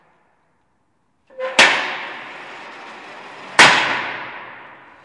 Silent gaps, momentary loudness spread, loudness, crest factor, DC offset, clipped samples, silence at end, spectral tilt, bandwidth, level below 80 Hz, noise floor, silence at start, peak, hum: none; 25 LU; -14 LUFS; 20 dB; under 0.1%; under 0.1%; 0.4 s; -1 dB/octave; 11.5 kHz; -62 dBFS; -66 dBFS; 1.4 s; 0 dBFS; none